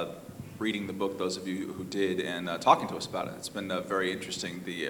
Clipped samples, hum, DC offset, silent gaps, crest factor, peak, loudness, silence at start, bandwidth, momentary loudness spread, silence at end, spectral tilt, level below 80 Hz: under 0.1%; none; under 0.1%; none; 24 dB; -6 dBFS; -31 LUFS; 0 s; over 20 kHz; 11 LU; 0 s; -4 dB/octave; -66 dBFS